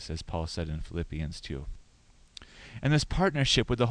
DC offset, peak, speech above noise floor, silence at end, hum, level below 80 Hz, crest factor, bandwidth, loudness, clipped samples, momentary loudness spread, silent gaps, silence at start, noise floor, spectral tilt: under 0.1%; -10 dBFS; 30 dB; 0 s; none; -40 dBFS; 20 dB; 10.5 kHz; -30 LUFS; under 0.1%; 22 LU; none; 0 s; -59 dBFS; -5 dB/octave